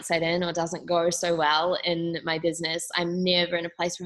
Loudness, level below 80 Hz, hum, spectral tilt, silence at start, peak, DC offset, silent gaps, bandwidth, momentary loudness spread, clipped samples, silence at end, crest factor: -25 LUFS; -64 dBFS; none; -3.5 dB/octave; 0 s; -8 dBFS; under 0.1%; none; 12.5 kHz; 6 LU; under 0.1%; 0 s; 18 dB